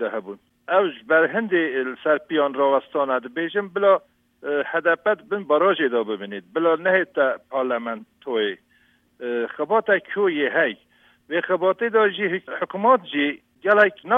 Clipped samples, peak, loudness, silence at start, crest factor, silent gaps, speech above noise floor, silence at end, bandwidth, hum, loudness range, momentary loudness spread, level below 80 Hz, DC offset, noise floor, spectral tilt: under 0.1%; -4 dBFS; -22 LUFS; 0 s; 18 dB; none; 39 dB; 0 s; 4 kHz; none; 3 LU; 10 LU; -76 dBFS; under 0.1%; -61 dBFS; -7 dB/octave